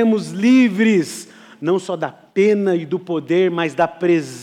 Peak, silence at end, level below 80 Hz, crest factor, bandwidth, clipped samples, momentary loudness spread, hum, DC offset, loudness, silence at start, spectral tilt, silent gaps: -6 dBFS; 0 s; -70 dBFS; 12 dB; 13.5 kHz; under 0.1%; 12 LU; none; under 0.1%; -18 LUFS; 0 s; -6 dB/octave; none